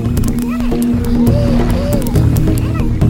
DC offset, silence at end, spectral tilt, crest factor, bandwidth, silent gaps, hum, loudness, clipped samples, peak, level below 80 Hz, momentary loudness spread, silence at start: under 0.1%; 0 s; -7.5 dB/octave; 12 dB; 17 kHz; none; none; -14 LUFS; under 0.1%; 0 dBFS; -18 dBFS; 4 LU; 0 s